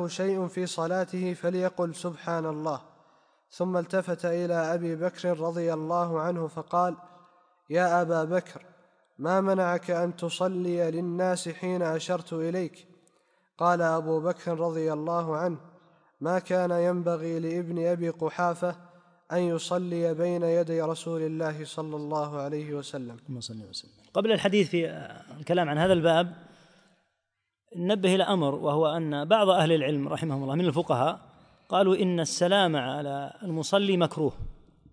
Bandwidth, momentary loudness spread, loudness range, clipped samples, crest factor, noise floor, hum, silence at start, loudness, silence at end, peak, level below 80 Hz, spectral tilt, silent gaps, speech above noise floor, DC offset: 10.5 kHz; 11 LU; 5 LU; under 0.1%; 20 dB; -83 dBFS; none; 0 s; -28 LUFS; 0.35 s; -8 dBFS; -60 dBFS; -5.5 dB/octave; none; 56 dB; under 0.1%